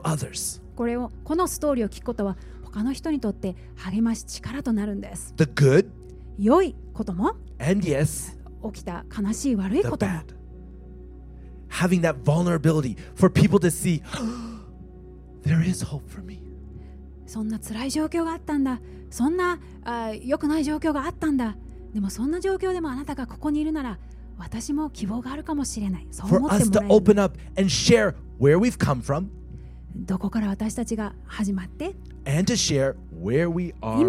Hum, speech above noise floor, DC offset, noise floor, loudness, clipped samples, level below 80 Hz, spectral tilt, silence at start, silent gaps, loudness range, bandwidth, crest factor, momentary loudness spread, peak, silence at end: none; 20 dB; under 0.1%; -43 dBFS; -24 LUFS; under 0.1%; -42 dBFS; -6 dB/octave; 0 s; none; 8 LU; 16 kHz; 22 dB; 20 LU; -4 dBFS; 0 s